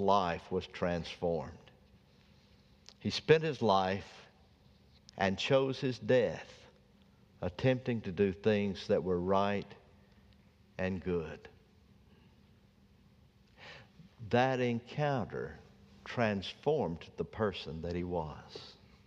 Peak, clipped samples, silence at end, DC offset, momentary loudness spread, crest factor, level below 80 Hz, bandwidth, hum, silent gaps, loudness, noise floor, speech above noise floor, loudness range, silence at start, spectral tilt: -10 dBFS; under 0.1%; 0.35 s; under 0.1%; 22 LU; 26 dB; -62 dBFS; 9 kHz; none; none; -34 LUFS; -64 dBFS; 31 dB; 10 LU; 0 s; -6.5 dB/octave